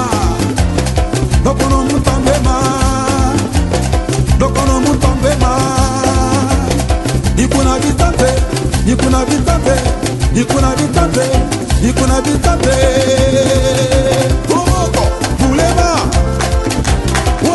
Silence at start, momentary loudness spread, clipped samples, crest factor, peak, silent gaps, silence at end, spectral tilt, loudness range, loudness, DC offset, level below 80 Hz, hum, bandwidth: 0 s; 3 LU; under 0.1%; 12 dB; 0 dBFS; none; 0 s; -5.5 dB/octave; 1 LU; -13 LUFS; under 0.1%; -18 dBFS; none; 12 kHz